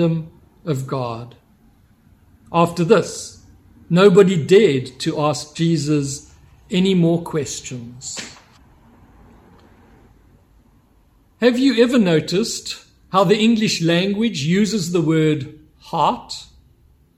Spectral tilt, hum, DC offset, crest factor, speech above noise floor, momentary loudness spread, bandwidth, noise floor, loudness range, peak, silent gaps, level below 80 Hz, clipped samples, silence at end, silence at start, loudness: -5.5 dB/octave; none; under 0.1%; 18 dB; 38 dB; 18 LU; 14.5 kHz; -55 dBFS; 9 LU; 0 dBFS; none; -54 dBFS; under 0.1%; 0.75 s; 0 s; -18 LUFS